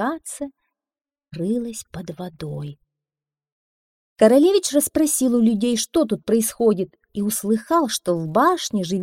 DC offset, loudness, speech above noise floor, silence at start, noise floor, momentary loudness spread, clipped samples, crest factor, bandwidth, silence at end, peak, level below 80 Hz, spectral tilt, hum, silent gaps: under 0.1%; -20 LUFS; over 70 dB; 0 s; under -90 dBFS; 16 LU; under 0.1%; 20 dB; 16.5 kHz; 0 s; -2 dBFS; -56 dBFS; -4.5 dB/octave; none; 3.52-4.16 s